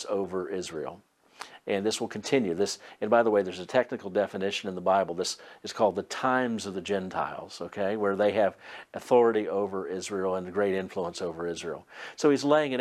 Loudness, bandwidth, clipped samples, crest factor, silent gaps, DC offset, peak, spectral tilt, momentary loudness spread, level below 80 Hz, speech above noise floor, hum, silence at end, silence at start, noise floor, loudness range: -28 LUFS; 13.5 kHz; under 0.1%; 20 dB; none; under 0.1%; -8 dBFS; -4.5 dB/octave; 14 LU; -70 dBFS; 20 dB; none; 0 s; 0 s; -48 dBFS; 2 LU